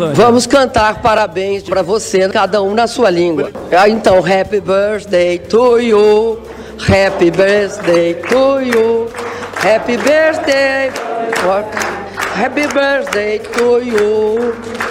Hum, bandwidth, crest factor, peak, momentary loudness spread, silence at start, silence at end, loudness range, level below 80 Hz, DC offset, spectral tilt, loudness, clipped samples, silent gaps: none; 16 kHz; 10 dB; -2 dBFS; 9 LU; 0 s; 0 s; 3 LU; -40 dBFS; under 0.1%; -4.5 dB/octave; -12 LUFS; under 0.1%; none